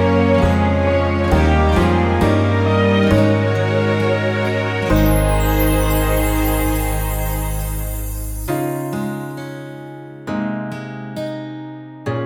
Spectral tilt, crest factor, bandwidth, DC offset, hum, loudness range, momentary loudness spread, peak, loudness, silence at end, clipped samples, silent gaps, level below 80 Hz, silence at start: -6.5 dB/octave; 14 dB; over 20 kHz; under 0.1%; none; 10 LU; 14 LU; -2 dBFS; -17 LUFS; 0 s; under 0.1%; none; -24 dBFS; 0 s